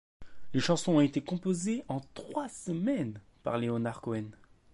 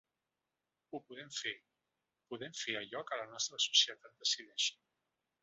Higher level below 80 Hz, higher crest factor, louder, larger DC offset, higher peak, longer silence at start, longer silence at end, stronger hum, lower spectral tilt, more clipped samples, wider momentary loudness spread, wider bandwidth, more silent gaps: first, -64 dBFS vs -90 dBFS; second, 18 dB vs 28 dB; first, -32 LUFS vs -36 LUFS; neither; about the same, -14 dBFS vs -14 dBFS; second, 0.2 s vs 0.9 s; second, 0 s vs 0.7 s; neither; first, -6 dB/octave vs 1.5 dB/octave; neither; second, 12 LU vs 20 LU; first, 11.5 kHz vs 8 kHz; neither